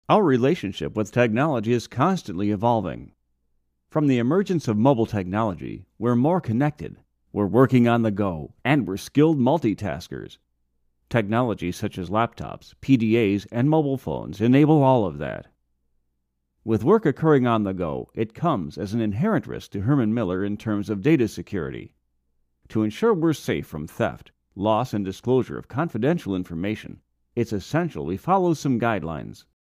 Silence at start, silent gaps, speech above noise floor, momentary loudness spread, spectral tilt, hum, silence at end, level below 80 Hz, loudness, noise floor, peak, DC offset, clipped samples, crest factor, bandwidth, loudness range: 0.1 s; none; 52 dB; 14 LU; -7.5 dB/octave; none; 0.35 s; -52 dBFS; -23 LUFS; -74 dBFS; -4 dBFS; under 0.1%; under 0.1%; 20 dB; 15.5 kHz; 4 LU